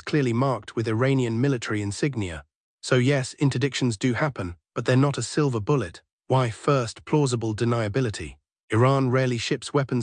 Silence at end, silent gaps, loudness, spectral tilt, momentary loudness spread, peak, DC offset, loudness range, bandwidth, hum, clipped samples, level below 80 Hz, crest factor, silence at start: 0 s; 2.55-2.78 s, 6.13-6.19 s, 8.60-8.68 s; -24 LUFS; -6 dB/octave; 8 LU; -8 dBFS; under 0.1%; 1 LU; 10 kHz; none; under 0.1%; -56 dBFS; 16 dB; 0.05 s